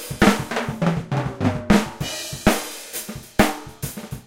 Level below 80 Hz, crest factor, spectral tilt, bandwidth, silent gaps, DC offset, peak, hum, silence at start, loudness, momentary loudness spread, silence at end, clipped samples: -36 dBFS; 20 dB; -5 dB/octave; 17 kHz; none; under 0.1%; -2 dBFS; none; 0 s; -22 LUFS; 12 LU; 0.05 s; under 0.1%